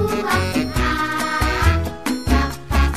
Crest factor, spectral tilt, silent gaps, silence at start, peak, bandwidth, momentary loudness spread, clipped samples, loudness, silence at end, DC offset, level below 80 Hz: 16 dB; -5.5 dB/octave; none; 0 s; -4 dBFS; 15 kHz; 4 LU; under 0.1%; -20 LUFS; 0 s; 1%; -24 dBFS